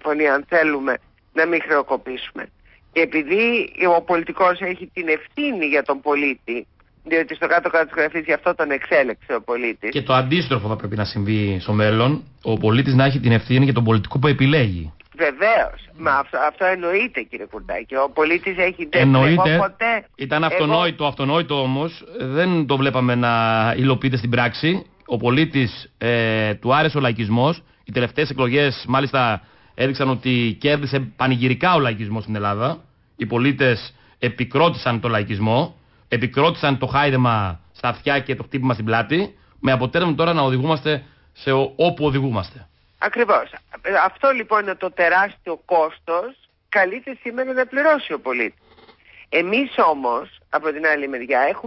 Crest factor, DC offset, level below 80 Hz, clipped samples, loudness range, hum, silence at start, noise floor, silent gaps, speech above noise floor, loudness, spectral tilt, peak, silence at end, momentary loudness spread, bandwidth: 14 dB; under 0.1%; -48 dBFS; under 0.1%; 3 LU; none; 0.05 s; -50 dBFS; none; 31 dB; -19 LUFS; -11 dB/octave; -6 dBFS; 0 s; 9 LU; 5.8 kHz